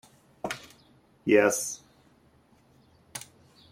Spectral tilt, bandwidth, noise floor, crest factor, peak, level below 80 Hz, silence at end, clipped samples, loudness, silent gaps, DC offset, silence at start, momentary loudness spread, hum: -3.5 dB/octave; 16 kHz; -62 dBFS; 24 dB; -8 dBFS; -70 dBFS; 0.5 s; under 0.1%; -27 LUFS; none; under 0.1%; 0.45 s; 20 LU; none